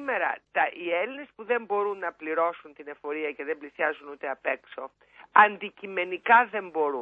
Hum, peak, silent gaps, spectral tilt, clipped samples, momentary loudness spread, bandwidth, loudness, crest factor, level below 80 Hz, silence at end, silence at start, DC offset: none; -4 dBFS; none; -6.5 dB/octave; under 0.1%; 18 LU; 4.4 kHz; -27 LUFS; 24 dB; -76 dBFS; 0 s; 0 s; under 0.1%